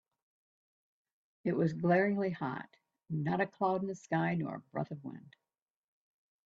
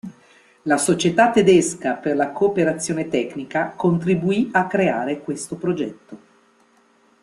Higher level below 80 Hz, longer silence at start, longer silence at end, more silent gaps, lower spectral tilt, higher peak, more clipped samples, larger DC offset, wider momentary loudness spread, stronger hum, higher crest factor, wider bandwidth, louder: second, -76 dBFS vs -60 dBFS; first, 1.45 s vs 0.05 s; first, 1.3 s vs 1.05 s; neither; first, -8 dB/octave vs -5 dB/octave; second, -18 dBFS vs -2 dBFS; neither; neither; first, 16 LU vs 11 LU; neither; about the same, 18 dB vs 20 dB; second, 7.6 kHz vs 12.5 kHz; second, -34 LUFS vs -20 LUFS